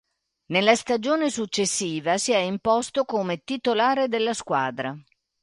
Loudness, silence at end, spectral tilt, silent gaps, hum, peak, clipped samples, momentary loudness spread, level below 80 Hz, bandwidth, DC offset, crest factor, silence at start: -24 LUFS; 0.4 s; -3.5 dB/octave; none; none; -4 dBFS; under 0.1%; 7 LU; -64 dBFS; 11.5 kHz; under 0.1%; 20 dB; 0.5 s